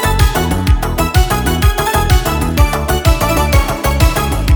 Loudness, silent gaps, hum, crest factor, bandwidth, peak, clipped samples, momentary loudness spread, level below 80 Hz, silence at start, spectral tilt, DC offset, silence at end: -13 LUFS; none; none; 12 dB; over 20 kHz; 0 dBFS; under 0.1%; 2 LU; -16 dBFS; 0 s; -5 dB/octave; under 0.1%; 0 s